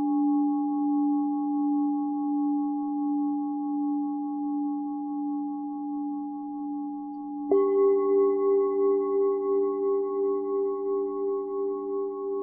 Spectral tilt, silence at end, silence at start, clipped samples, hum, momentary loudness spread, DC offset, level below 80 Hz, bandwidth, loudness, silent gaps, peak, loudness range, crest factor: -10 dB/octave; 0 s; 0 s; under 0.1%; none; 10 LU; under 0.1%; -72 dBFS; 2.2 kHz; -27 LUFS; none; -12 dBFS; 6 LU; 14 dB